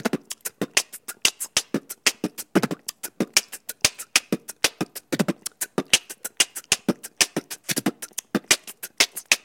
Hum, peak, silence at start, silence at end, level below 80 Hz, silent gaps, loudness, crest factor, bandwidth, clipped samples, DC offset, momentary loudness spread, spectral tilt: none; 0 dBFS; 0.05 s; 0.05 s; -64 dBFS; none; -24 LUFS; 26 dB; 17 kHz; under 0.1%; under 0.1%; 11 LU; -1.5 dB/octave